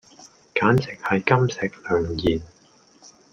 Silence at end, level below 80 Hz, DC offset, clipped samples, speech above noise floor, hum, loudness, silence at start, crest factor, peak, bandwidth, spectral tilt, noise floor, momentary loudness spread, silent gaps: 0.85 s; -48 dBFS; under 0.1%; under 0.1%; 34 dB; none; -22 LUFS; 0.2 s; 22 dB; -2 dBFS; 9.2 kHz; -6.5 dB/octave; -55 dBFS; 8 LU; none